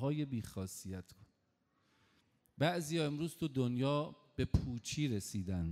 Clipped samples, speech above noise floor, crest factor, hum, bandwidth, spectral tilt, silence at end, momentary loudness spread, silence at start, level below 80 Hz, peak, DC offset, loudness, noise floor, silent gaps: under 0.1%; 42 dB; 22 dB; none; 15.5 kHz; -6 dB/octave; 0 s; 9 LU; 0 s; -52 dBFS; -18 dBFS; under 0.1%; -38 LUFS; -79 dBFS; none